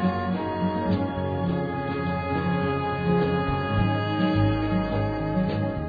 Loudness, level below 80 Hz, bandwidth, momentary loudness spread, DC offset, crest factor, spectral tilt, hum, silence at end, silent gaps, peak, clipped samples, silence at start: -25 LUFS; -40 dBFS; 5 kHz; 4 LU; under 0.1%; 14 dB; -10 dB/octave; none; 0 s; none; -10 dBFS; under 0.1%; 0 s